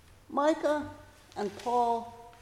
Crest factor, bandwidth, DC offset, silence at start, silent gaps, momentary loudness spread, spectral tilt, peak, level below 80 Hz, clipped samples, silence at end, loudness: 18 dB; 15 kHz; under 0.1%; 0.3 s; none; 17 LU; -5 dB/octave; -14 dBFS; -62 dBFS; under 0.1%; 0.1 s; -31 LUFS